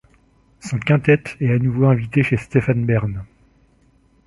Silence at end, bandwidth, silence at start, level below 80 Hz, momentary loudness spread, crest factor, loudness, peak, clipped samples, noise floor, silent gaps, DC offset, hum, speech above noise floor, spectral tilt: 1 s; 11.5 kHz; 0.65 s; -46 dBFS; 12 LU; 18 dB; -18 LUFS; -2 dBFS; under 0.1%; -56 dBFS; none; under 0.1%; none; 39 dB; -8 dB/octave